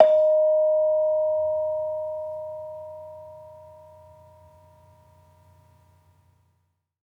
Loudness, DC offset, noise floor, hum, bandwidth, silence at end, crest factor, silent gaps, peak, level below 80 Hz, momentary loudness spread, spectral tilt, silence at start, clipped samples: -23 LUFS; under 0.1%; -72 dBFS; none; 3.8 kHz; 3.45 s; 24 dB; none; -2 dBFS; -72 dBFS; 23 LU; -6.5 dB/octave; 0 s; under 0.1%